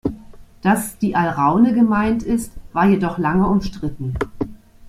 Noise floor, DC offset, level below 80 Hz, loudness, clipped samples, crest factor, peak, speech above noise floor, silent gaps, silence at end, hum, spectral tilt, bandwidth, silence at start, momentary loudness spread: -40 dBFS; under 0.1%; -38 dBFS; -19 LUFS; under 0.1%; 16 dB; -2 dBFS; 23 dB; none; 0 s; none; -7 dB/octave; 15.5 kHz; 0.05 s; 12 LU